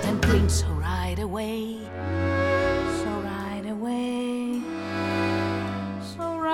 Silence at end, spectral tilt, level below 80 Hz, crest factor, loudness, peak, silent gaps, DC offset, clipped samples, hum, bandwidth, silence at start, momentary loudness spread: 0 s; -6 dB/octave; -36 dBFS; 18 dB; -27 LUFS; -8 dBFS; none; under 0.1%; under 0.1%; none; 15.5 kHz; 0 s; 10 LU